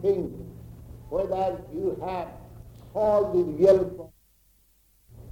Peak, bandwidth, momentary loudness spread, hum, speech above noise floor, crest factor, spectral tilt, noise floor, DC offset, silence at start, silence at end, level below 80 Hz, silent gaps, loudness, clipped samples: -8 dBFS; 16.5 kHz; 26 LU; none; 38 dB; 20 dB; -8.5 dB/octave; -63 dBFS; under 0.1%; 0 s; 0 s; -50 dBFS; none; -26 LUFS; under 0.1%